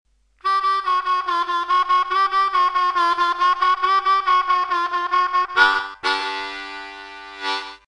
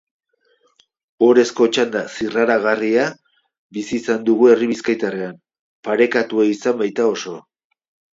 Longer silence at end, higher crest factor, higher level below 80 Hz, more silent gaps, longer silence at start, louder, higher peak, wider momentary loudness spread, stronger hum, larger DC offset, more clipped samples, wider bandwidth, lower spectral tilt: second, 0.1 s vs 0.7 s; about the same, 18 dB vs 18 dB; first, -58 dBFS vs -64 dBFS; second, none vs 3.58-3.70 s, 5.59-5.83 s; second, 0.45 s vs 1.2 s; about the same, -19 LUFS vs -17 LUFS; about the same, -2 dBFS vs -2 dBFS; about the same, 12 LU vs 14 LU; neither; neither; neither; first, 10.5 kHz vs 7.8 kHz; second, -0.5 dB/octave vs -4.5 dB/octave